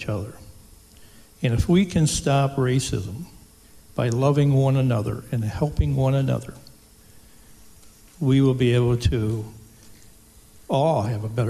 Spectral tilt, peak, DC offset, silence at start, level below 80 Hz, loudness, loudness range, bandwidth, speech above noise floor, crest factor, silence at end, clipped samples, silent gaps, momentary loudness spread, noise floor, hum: -6.5 dB/octave; -8 dBFS; under 0.1%; 0 s; -38 dBFS; -22 LUFS; 3 LU; 13.5 kHz; 29 dB; 14 dB; 0 s; under 0.1%; none; 12 LU; -50 dBFS; none